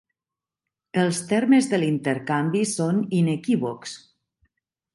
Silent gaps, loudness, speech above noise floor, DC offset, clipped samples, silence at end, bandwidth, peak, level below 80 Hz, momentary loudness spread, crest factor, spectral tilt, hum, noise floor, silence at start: none; -23 LUFS; 67 dB; under 0.1%; under 0.1%; 0.95 s; 11.5 kHz; -8 dBFS; -68 dBFS; 11 LU; 16 dB; -5.5 dB/octave; none; -89 dBFS; 0.95 s